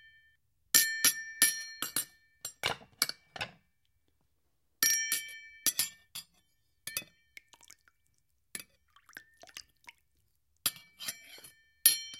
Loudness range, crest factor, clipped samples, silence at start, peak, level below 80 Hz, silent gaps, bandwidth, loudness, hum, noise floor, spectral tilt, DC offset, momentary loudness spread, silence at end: 17 LU; 34 dB; under 0.1%; 0.75 s; -4 dBFS; -74 dBFS; none; 16.5 kHz; -30 LUFS; none; -80 dBFS; 1.5 dB/octave; under 0.1%; 22 LU; 0 s